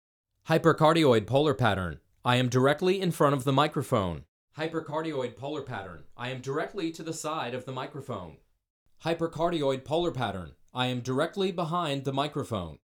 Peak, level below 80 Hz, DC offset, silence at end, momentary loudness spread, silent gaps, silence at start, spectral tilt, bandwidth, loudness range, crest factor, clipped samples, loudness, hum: -10 dBFS; -58 dBFS; under 0.1%; 0.15 s; 14 LU; 4.28-4.48 s, 8.70-8.86 s; 0.45 s; -6 dB/octave; 18.5 kHz; 10 LU; 20 dB; under 0.1%; -28 LUFS; none